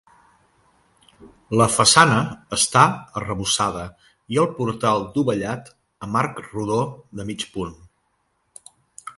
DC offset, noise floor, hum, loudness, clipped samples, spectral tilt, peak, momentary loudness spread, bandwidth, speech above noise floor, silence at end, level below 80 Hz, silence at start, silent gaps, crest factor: under 0.1%; -69 dBFS; none; -20 LUFS; under 0.1%; -3.5 dB/octave; 0 dBFS; 18 LU; 12 kHz; 48 dB; 0.1 s; -52 dBFS; 1.2 s; none; 22 dB